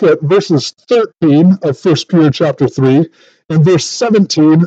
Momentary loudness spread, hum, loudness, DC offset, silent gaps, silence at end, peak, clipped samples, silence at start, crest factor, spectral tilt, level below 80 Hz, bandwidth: 5 LU; none; -11 LUFS; under 0.1%; none; 0 s; 0 dBFS; under 0.1%; 0 s; 10 dB; -6.5 dB/octave; -56 dBFS; 8.2 kHz